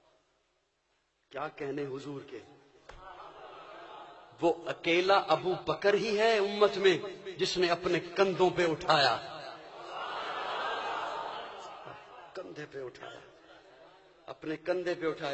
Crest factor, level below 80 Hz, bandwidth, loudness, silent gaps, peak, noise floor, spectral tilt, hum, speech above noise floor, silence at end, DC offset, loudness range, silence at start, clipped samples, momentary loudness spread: 22 dB; -66 dBFS; 8.4 kHz; -30 LUFS; none; -10 dBFS; -76 dBFS; -4.5 dB/octave; none; 46 dB; 0 s; under 0.1%; 15 LU; 1.3 s; under 0.1%; 22 LU